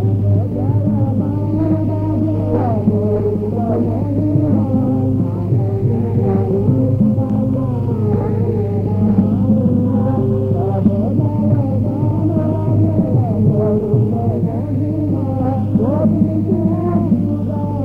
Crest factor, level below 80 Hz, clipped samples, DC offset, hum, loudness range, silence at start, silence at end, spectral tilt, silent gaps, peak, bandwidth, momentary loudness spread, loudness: 12 dB; -36 dBFS; under 0.1%; under 0.1%; none; 1 LU; 0 s; 0 s; -12 dB/octave; none; -2 dBFS; 3 kHz; 3 LU; -16 LUFS